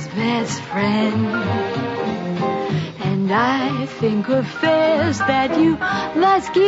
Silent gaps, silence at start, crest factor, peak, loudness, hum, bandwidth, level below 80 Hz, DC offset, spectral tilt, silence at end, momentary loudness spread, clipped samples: none; 0 s; 12 dB; -6 dBFS; -19 LUFS; none; 8 kHz; -54 dBFS; under 0.1%; -6 dB/octave; 0 s; 7 LU; under 0.1%